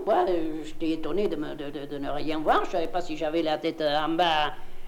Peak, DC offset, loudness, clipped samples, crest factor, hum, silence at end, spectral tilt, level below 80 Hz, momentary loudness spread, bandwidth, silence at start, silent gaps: -10 dBFS; under 0.1%; -28 LUFS; under 0.1%; 16 dB; none; 0 s; -5 dB/octave; -40 dBFS; 10 LU; 11.5 kHz; 0 s; none